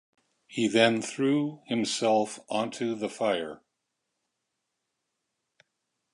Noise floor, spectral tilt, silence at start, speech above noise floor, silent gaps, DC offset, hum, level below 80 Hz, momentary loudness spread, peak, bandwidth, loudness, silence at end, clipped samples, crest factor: -82 dBFS; -4 dB/octave; 0.5 s; 55 dB; none; under 0.1%; none; -76 dBFS; 9 LU; -8 dBFS; 11.5 kHz; -27 LUFS; 2.6 s; under 0.1%; 24 dB